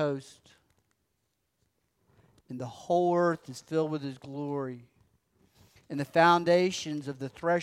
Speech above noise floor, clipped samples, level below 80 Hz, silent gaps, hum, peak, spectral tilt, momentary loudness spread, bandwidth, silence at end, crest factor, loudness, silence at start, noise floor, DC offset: 50 dB; under 0.1%; -74 dBFS; none; none; -10 dBFS; -5.5 dB/octave; 17 LU; 14 kHz; 0 s; 22 dB; -29 LUFS; 0 s; -79 dBFS; under 0.1%